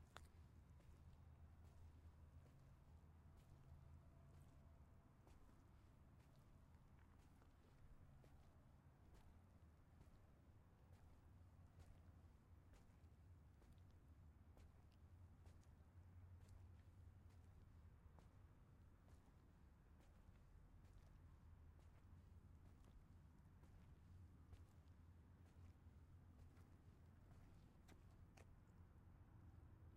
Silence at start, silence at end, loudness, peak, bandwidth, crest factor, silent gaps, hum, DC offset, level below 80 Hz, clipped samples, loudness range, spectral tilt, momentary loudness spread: 0 s; 0 s; -69 LUFS; -38 dBFS; 10 kHz; 28 dB; none; none; under 0.1%; -72 dBFS; under 0.1%; 1 LU; -6.5 dB/octave; 3 LU